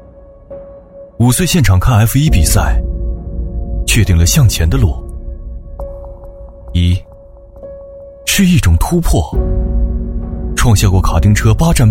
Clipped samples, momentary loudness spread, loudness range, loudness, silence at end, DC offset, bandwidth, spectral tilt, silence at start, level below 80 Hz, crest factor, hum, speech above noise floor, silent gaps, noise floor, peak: under 0.1%; 22 LU; 6 LU; -13 LUFS; 0 s; under 0.1%; 16.5 kHz; -5 dB/octave; 0.5 s; -18 dBFS; 12 dB; none; 28 dB; none; -37 dBFS; 0 dBFS